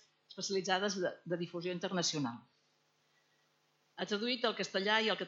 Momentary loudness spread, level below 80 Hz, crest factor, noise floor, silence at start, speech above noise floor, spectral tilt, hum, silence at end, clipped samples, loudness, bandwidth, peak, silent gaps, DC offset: 12 LU; under -90 dBFS; 22 dB; -75 dBFS; 0.3 s; 40 dB; -3 dB/octave; none; 0 s; under 0.1%; -36 LUFS; 8 kHz; -16 dBFS; none; under 0.1%